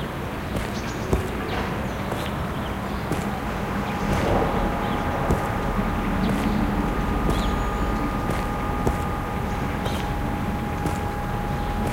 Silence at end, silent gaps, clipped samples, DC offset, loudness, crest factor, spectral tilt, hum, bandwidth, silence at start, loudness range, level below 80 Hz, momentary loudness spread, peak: 0 s; none; under 0.1%; under 0.1%; -26 LUFS; 18 dB; -6.5 dB/octave; none; 17 kHz; 0 s; 3 LU; -32 dBFS; 5 LU; -6 dBFS